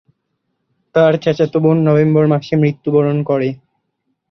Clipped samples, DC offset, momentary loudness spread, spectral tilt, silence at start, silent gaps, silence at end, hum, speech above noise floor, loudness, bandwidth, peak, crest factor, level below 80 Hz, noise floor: under 0.1%; under 0.1%; 6 LU; -9 dB/octave; 0.95 s; none; 0.75 s; none; 57 dB; -14 LUFS; 6.4 kHz; -2 dBFS; 14 dB; -56 dBFS; -70 dBFS